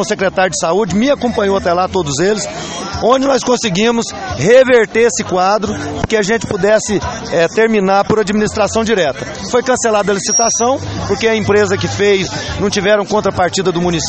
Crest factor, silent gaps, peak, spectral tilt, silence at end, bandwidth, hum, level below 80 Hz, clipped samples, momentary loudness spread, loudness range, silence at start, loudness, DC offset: 14 dB; none; 0 dBFS; -4 dB/octave; 0 s; 8.8 kHz; none; -38 dBFS; under 0.1%; 7 LU; 2 LU; 0 s; -13 LUFS; under 0.1%